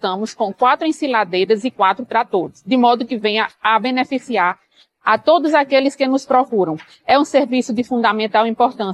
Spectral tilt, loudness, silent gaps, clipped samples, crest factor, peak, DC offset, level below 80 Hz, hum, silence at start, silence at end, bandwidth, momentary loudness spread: -4.5 dB/octave; -17 LUFS; none; under 0.1%; 16 dB; 0 dBFS; under 0.1%; -64 dBFS; none; 0.05 s; 0 s; 11.5 kHz; 7 LU